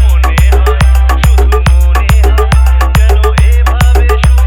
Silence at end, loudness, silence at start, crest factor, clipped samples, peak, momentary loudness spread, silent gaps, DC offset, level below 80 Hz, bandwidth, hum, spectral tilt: 0 s; -8 LUFS; 0 s; 6 dB; 0.7%; 0 dBFS; 1 LU; none; under 0.1%; -6 dBFS; 14.5 kHz; none; -6 dB/octave